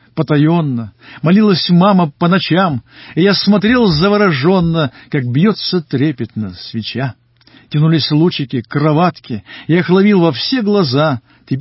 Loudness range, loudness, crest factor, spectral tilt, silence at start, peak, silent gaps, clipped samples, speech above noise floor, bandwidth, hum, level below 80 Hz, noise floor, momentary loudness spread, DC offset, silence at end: 5 LU; -13 LUFS; 12 dB; -10.5 dB/octave; 0.15 s; -2 dBFS; none; under 0.1%; 34 dB; 5.8 kHz; none; -44 dBFS; -46 dBFS; 13 LU; under 0.1%; 0 s